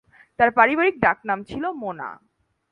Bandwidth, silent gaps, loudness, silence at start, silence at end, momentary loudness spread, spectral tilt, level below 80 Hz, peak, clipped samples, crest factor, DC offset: 7 kHz; none; -21 LUFS; 0.4 s; 0.55 s; 15 LU; -7 dB/octave; -56 dBFS; -2 dBFS; under 0.1%; 22 dB; under 0.1%